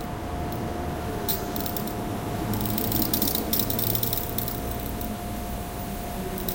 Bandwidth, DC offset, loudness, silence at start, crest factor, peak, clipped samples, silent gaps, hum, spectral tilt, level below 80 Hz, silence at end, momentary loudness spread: 18 kHz; under 0.1%; -27 LUFS; 0 s; 24 dB; -4 dBFS; under 0.1%; none; none; -4.5 dB/octave; -38 dBFS; 0 s; 10 LU